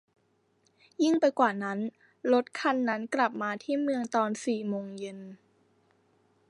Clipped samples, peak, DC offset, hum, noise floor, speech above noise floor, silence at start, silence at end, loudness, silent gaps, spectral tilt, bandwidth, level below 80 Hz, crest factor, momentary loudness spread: under 0.1%; -10 dBFS; under 0.1%; none; -71 dBFS; 42 dB; 1 s; 1.15 s; -29 LUFS; none; -5 dB/octave; 11 kHz; -84 dBFS; 22 dB; 15 LU